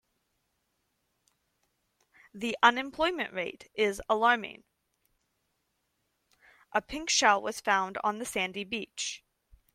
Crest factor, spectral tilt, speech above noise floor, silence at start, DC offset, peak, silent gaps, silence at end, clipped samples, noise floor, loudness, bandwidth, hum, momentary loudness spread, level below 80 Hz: 26 dB; -1.5 dB/octave; 49 dB; 2.35 s; under 0.1%; -6 dBFS; none; 0.6 s; under 0.1%; -79 dBFS; -29 LUFS; 16 kHz; none; 12 LU; -64 dBFS